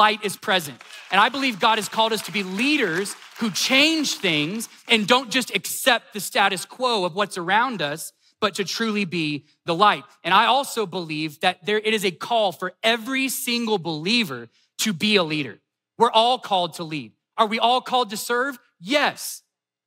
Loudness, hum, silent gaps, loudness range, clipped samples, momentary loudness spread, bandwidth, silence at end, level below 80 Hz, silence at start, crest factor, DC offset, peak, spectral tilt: -21 LUFS; none; none; 3 LU; under 0.1%; 10 LU; 16 kHz; 0.5 s; -84 dBFS; 0 s; 20 dB; under 0.1%; -2 dBFS; -3 dB/octave